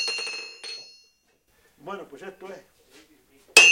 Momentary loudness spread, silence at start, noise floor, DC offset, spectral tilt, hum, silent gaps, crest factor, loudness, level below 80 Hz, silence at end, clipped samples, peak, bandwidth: 26 LU; 0 s; -66 dBFS; under 0.1%; 1.5 dB/octave; none; none; 26 dB; -21 LUFS; -70 dBFS; 0 s; under 0.1%; 0 dBFS; 16.5 kHz